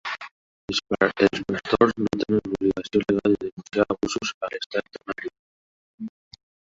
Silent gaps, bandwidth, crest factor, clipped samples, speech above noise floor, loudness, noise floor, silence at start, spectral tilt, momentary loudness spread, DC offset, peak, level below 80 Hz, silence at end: 0.31-0.68 s, 3.52-3.57 s, 4.34-4.41 s, 4.66-4.70 s, 5.39-5.98 s; 8 kHz; 24 dB; under 0.1%; over 66 dB; -24 LUFS; under -90 dBFS; 0.05 s; -5 dB/octave; 17 LU; under 0.1%; -2 dBFS; -54 dBFS; 0.65 s